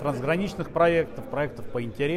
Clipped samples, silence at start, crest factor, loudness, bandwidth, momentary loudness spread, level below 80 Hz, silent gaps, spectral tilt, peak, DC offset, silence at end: under 0.1%; 0 s; 18 dB; -26 LUFS; 14 kHz; 10 LU; -48 dBFS; none; -7 dB/octave; -8 dBFS; under 0.1%; 0 s